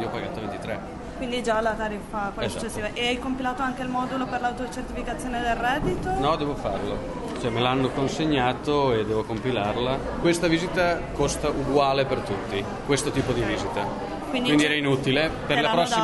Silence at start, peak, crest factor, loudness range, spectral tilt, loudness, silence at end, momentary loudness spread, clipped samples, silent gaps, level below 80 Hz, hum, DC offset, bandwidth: 0 s; -6 dBFS; 18 dB; 4 LU; -5 dB/octave; -25 LUFS; 0 s; 9 LU; under 0.1%; none; -40 dBFS; none; under 0.1%; 11.5 kHz